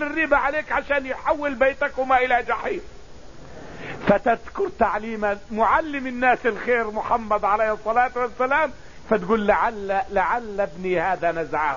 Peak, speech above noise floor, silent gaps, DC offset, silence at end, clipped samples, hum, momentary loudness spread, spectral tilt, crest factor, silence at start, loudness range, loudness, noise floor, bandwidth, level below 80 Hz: -4 dBFS; 21 dB; none; 0.9%; 0 s; under 0.1%; none; 7 LU; -6 dB/octave; 20 dB; 0 s; 2 LU; -22 LUFS; -43 dBFS; 7.4 kHz; -46 dBFS